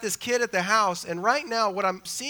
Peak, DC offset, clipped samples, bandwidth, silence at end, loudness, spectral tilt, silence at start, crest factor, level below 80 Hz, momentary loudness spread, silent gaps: -8 dBFS; under 0.1%; under 0.1%; over 20 kHz; 0 s; -25 LUFS; -2.5 dB/octave; 0 s; 18 dB; -68 dBFS; 5 LU; none